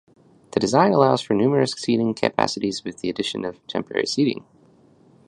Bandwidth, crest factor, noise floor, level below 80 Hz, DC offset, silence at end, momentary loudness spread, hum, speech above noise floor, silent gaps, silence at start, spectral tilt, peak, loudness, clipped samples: 11 kHz; 22 dB; -54 dBFS; -60 dBFS; under 0.1%; 0.9 s; 11 LU; none; 33 dB; none; 0.55 s; -5.5 dB/octave; -2 dBFS; -22 LUFS; under 0.1%